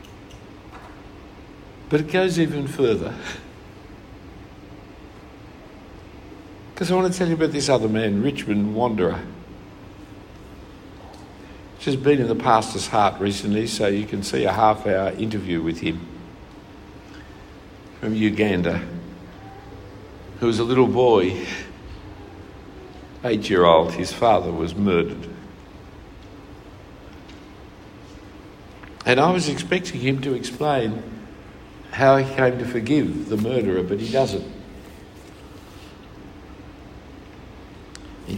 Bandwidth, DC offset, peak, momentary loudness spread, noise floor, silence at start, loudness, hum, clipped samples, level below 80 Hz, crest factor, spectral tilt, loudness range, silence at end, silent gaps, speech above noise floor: 16 kHz; under 0.1%; -2 dBFS; 24 LU; -42 dBFS; 0 s; -21 LUFS; none; under 0.1%; -48 dBFS; 22 dB; -5.5 dB/octave; 10 LU; 0 s; none; 22 dB